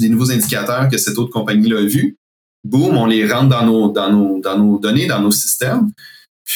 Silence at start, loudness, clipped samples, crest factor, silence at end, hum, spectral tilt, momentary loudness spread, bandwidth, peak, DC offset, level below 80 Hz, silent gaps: 0 s; -14 LUFS; under 0.1%; 14 dB; 0 s; none; -5 dB/octave; 5 LU; 19.5 kHz; 0 dBFS; under 0.1%; -60 dBFS; 2.18-2.63 s, 6.28-6.45 s